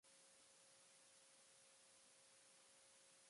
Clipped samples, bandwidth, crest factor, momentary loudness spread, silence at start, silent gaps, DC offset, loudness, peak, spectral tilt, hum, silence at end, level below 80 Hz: under 0.1%; 11.5 kHz; 14 dB; 0 LU; 0.05 s; none; under 0.1%; -68 LUFS; -58 dBFS; 0 dB/octave; none; 0 s; under -90 dBFS